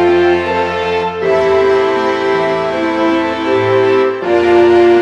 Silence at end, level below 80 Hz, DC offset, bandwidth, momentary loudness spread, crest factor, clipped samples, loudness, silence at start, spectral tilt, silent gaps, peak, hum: 0 s; -44 dBFS; under 0.1%; 8.4 kHz; 6 LU; 12 dB; under 0.1%; -12 LUFS; 0 s; -6 dB/octave; none; 0 dBFS; none